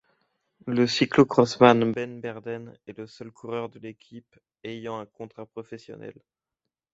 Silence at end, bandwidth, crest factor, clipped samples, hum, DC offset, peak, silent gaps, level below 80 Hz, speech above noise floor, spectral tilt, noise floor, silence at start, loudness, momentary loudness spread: 0.8 s; 8 kHz; 24 dB; under 0.1%; none; under 0.1%; -2 dBFS; none; -66 dBFS; 61 dB; -6 dB/octave; -87 dBFS; 0.65 s; -23 LUFS; 24 LU